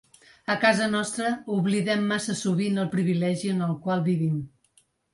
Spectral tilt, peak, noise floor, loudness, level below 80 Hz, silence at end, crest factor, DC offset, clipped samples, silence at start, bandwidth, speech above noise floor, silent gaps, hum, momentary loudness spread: -5.5 dB/octave; -6 dBFS; -65 dBFS; -25 LUFS; -66 dBFS; 0.65 s; 20 dB; under 0.1%; under 0.1%; 0.5 s; 11.5 kHz; 40 dB; none; none; 7 LU